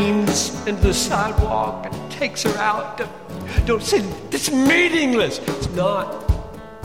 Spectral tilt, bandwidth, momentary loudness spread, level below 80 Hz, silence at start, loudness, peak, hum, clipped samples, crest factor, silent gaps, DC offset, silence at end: -4.5 dB/octave; 16.5 kHz; 12 LU; -30 dBFS; 0 s; -20 LUFS; -4 dBFS; none; under 0.1%; 16 dB; none; 0.5%; 0 s